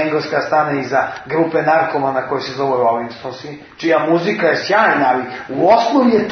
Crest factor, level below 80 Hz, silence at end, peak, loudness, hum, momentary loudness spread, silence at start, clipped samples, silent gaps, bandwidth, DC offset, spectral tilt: 14 dB; -58 dBFS; 0 s; -2 dBFS; -15 LUFS; none; 10 LU; 0 s; under 0.1%; none; 6.6 kHz; under 0.1%; -6 dB/octave